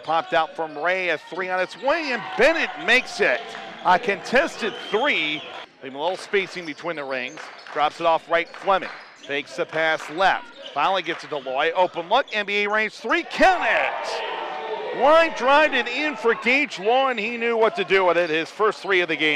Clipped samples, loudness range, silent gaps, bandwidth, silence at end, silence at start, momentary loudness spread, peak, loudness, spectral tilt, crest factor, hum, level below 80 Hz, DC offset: under 0.1%; 5 LU; none; 13.5 kHz; 0 s; 0 s; 11 LU; -6 dBFS; -22 LUFS; -3.5 dB/octave; 16 dB; none; -56 dBFS; under 0.1%